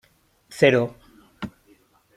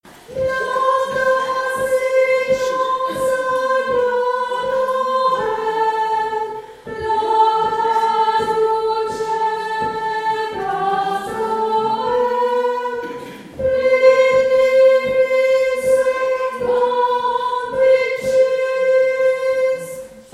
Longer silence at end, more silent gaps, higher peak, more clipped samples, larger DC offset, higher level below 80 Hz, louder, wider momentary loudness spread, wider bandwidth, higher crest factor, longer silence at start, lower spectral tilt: first, 0.7 s vs 0.1 s; neither; about the same, -2 dBFS vs -2 dBFS; neither; neither; second, -60 dBFS vs -52 dBFS; second, -20 LUFS vs -17 LUFS; first, 20 LU vs 8 LU; first, 15 kHz vs 13.5 kHz; first, 24 dB vs 16 dB; first, 0.5 s vs 0.05 s; first, -6 dB/octave vs -3.5 dB/octave